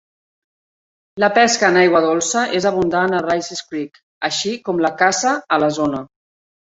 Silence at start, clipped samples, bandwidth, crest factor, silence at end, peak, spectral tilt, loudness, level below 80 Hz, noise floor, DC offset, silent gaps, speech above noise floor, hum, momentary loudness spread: 1.15 s; under 0.1%; 8 kHz; 16 dB; 0.7 s; -2 dBFS; -3.5 dB/octave; -17 LUFS; -58 dBFS; under -90 dBFS; under 0.1%; 4.03-4.21 s; over 73 dB; none; 13 LU